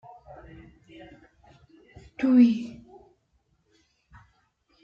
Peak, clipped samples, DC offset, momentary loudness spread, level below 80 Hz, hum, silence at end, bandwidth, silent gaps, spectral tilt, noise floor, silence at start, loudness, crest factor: -8 dBFS; under 0.1%; under 0.1%; 30 LU; -62 dBFS; none; 2.15 s; 6.6 kHz; none; -7.5 dB/octave; -70 dBFS; 2.2 s; -22 LUFS; 20 dB